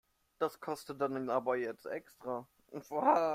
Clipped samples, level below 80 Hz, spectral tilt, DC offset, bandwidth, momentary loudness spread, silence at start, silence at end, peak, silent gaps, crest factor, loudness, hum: under 0.1%; -78 dBFS; -6 dB/octave; under 0.1%; 16 kHz; 12 LU; 0.4 s; 0 s; -14 dBFS; none; 22 dB; -36 LUFS; none